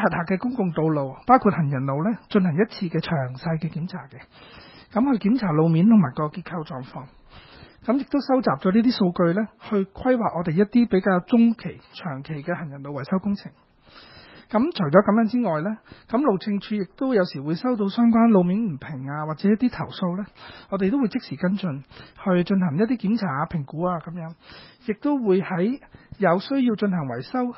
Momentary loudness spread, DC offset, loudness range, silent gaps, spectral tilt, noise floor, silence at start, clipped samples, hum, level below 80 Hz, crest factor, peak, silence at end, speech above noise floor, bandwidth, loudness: 14 LU; under 0.1%; 4 LU; none; -12 dB/octave; -49 dBFS; 0 s; under 0.1%; none; -56 dBFS; 22 dB; -2 dBFS; 0 s; 27 dB; 5.8 kHz; -23 LUFS